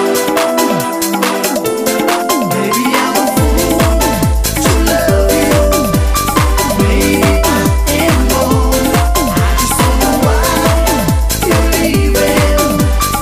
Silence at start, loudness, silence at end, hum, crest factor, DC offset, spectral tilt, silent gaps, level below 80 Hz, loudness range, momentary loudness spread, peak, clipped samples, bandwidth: 0 s; -12 LUFS; 0 s; none; 10 dB; under 0.1%; -4.5 dB/octave; none; -16 dBFS; 1 LU; 3 LU; 0 dBFS; under 0.1%; 16 kHz